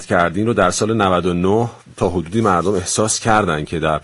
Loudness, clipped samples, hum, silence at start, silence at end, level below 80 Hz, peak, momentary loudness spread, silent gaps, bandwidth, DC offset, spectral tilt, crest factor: -17 LUFS; under 0.1%; none; 0 s; 0.05 s; -40 dBFS; 0 dBFS; 5 LU; none; 11.5 kHz; under 0.1%; -4.5 dB/octave; 16 dB